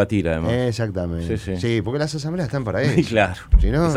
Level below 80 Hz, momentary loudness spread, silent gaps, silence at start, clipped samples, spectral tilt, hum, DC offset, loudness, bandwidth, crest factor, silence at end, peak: -26 dBFS; 7 LU; none; 0 s; under 0.1%; -6.5 dB/octave; none; under 0.1%; -21 LUFS; 12 kHz; 18 dB; 0 s; -2 dBFS